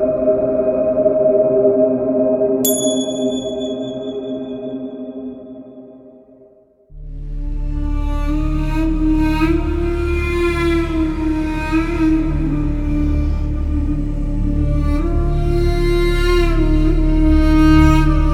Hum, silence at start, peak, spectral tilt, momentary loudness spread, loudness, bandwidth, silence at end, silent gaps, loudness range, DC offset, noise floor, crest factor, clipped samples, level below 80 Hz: none; 0 s; 0 dBFS; -6.5 dB/octave; 12 LU; -17 LUFS; 16 kHz; 0 s; none; 13 LU; under 0.1%; -48 dBFS; 16 dB; under 0.1%; -20 dBFS